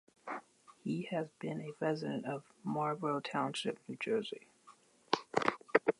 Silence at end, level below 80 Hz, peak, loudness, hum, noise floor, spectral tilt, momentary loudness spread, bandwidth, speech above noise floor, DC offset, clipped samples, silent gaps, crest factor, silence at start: 0.05 s; -82 dBFS; -10 dBFS; -38 LUFS; none; -64 dBFS; -5.5 dB/octave; 12 LU; 11.5 kHz; 26 dB; under 0.1%; under 0.1%; none; 28 dB; 0.25 s